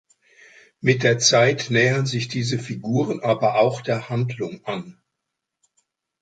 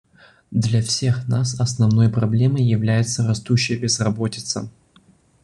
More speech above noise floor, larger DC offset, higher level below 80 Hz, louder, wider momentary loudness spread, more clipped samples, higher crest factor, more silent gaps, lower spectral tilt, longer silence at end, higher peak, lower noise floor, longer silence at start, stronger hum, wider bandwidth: first, 61 dB vs 36 dB; neither; second, -62 dBFS vs -50 dBFS; about the same, -21 LUFS vs -20 LUFS; first, 12 LU vs 8 LU; neither; about the same, 20 dB vs 16 dB; neither; about the same, -4.5 dB/octave vs -5.5 dB/octave; first, 1.3 s vs 0.75 s; about the same, -4 dBFS vs -4 dBFS; first, -81 dBFS vs -55 dBFS; first, 0.85 s vs 0.5 s; neither; second, 9.2 kHz vs 11 kHz